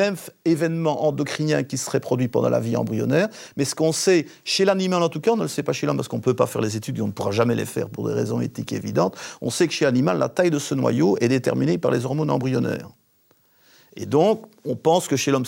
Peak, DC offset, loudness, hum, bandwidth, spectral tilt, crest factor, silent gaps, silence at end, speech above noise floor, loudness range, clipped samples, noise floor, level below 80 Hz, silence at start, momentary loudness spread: -6 dBFS; under 0.1%; -22 LUFS; none; 16.5 kHz; -5.5 dB/octave; 16 dB; none; 0 s; 40 dB; 3 LU; under 0.1%; -61 dBFS; -66 dBFS; 0 s; 7 LU